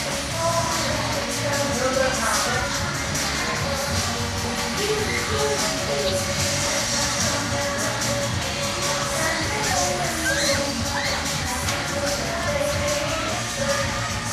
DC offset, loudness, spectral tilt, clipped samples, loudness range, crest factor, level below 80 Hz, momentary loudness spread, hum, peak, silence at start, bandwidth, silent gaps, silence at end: under 0.1%; -22 LUFS; -2.5 dB/octave; under 0.1%; 1 LU; 14 dB; -40 dBFS; 3 LU; none; -8 dBFS; 0 s; 15.5 kHz; none; 0 s